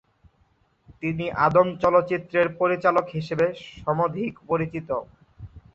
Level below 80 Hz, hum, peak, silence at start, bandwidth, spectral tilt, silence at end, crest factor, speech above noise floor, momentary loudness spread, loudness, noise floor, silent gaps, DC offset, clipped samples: -54 dBFS; none; -4 dBFS; 1 s; 7.4 kHz; -8 dB/octave; 0.15 s; 20 dB; 41 dB; 11 LU; -24 LUFS; -64 dBFS; none; under 0.1%; under 0.1%